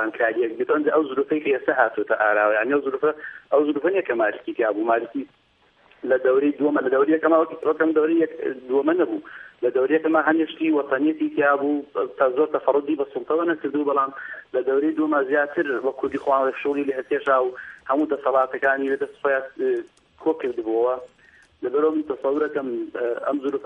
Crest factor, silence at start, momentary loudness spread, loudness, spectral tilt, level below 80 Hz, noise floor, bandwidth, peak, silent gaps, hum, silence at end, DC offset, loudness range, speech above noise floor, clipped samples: 20 dB; 0 s; 7 LU; -22 LUFS; -7 dB/octave; -70 dBFS; -59 dBFS; 3.9 kHz; -2 dBFS; none; none; 0 s; under 0.1%; 4 LU; 37 dB; under 0.1%